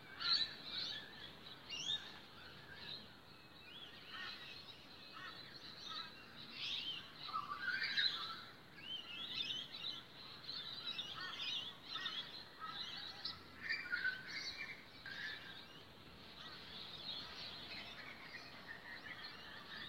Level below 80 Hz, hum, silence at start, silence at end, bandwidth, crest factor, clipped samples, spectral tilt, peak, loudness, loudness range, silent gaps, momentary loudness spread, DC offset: -76 dBFS; none; 0 s; 0 s; 16 kHz; 24 dB; under 0.1%; -1.5 dB/octave; -24 dBFS; -45 LUFS; 8 LU; none; 14 LU; under 0.1%